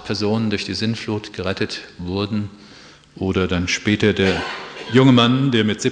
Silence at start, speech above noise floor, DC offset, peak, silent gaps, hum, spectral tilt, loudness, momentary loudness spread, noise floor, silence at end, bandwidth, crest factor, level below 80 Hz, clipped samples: 0 s; 26 dB; under 0.1%; -2 dBFS; none; none; -5.5 dB/octave; -19 LUFS; 13 LU; -45 dBFS; 0 s; 9.8 kHz; 18 dB; -48 dBFS; under 0.1%